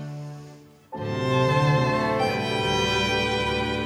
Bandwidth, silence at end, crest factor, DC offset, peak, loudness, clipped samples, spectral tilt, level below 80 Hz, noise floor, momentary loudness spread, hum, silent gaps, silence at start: 15.5 kHz; 0 s; 16 dB; under 0.1%; -10 dBFS; -23 LUFS; under 0.1%; -5.5 dB/octave; -44 dBFS; -47 dBFS; 16 LU; none; none; 0 s